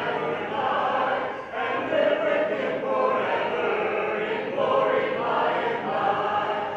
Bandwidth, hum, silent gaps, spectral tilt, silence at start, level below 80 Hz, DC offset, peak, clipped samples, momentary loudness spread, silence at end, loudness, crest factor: 8 kHz; none; none; -6 dB/octave; 0 s; -66 dBFS; under 0.1%; -10 dBFS; under 0.1%; 5 LU; 0 s; -25 LUFS; 14 dB